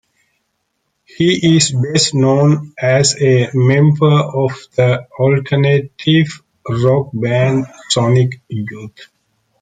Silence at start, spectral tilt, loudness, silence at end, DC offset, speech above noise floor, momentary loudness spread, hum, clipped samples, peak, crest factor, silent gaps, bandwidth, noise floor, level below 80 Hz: 1.2 s; -5.5 dB/octave; -14 LUFS; 0.6 s; under 0.1%; 55 dB; 10 LU; none; under 0.1%; 0 dBFS; 14 dB; none; 9.6 kHz; -69 dBFS; -52 dBFS